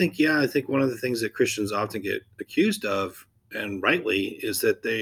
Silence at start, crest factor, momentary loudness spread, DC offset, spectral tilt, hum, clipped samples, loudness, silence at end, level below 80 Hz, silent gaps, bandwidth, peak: 0 s; 20 dB; 10 LU; under 0.1%; -4.5 dB/octave; none; under 0.1%; -25 LUFS; 0 s; -66 dBFS; none; 20 kHz; -6 dBFS